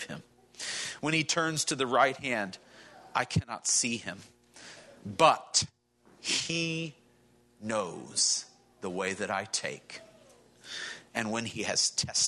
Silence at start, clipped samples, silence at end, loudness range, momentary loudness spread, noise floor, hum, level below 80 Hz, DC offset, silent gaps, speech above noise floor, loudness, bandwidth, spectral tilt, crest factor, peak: 0 s; under 0.1%; 0 s; 4 LU; 19 LU; -64 dBFS; none; -68 dBFS; under 0.1%; none; 34 dB; -30 LUFS; 12 kHz; -2 dB/octave; 24 dB; -8 dBFS